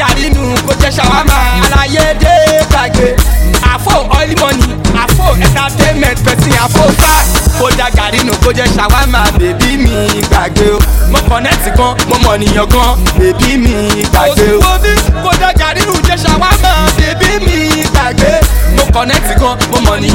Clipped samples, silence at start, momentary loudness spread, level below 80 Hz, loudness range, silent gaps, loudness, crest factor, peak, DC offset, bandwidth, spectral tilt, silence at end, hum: 0.6%; 0 s; 3 LU; -12 dBFS; 1 LU; none; -9 LUFS; 8 dB; 0 dBFS; 0.5%; 17.5 kHz; -4.5 dB/octave; 0 s; none